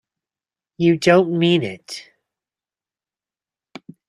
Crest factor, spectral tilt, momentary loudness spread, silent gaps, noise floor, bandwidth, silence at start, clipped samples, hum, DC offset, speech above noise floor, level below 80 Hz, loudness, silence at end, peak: 20 dB; -6 dB/octave; 19 LU; none; under -90 dBFS; 11.5 kHz; 0.8 s; under 0.1%; none; under 0.1%; over 73 dB; -64 dBFS; -17 LUFS; 2.05 s; -2 dBFS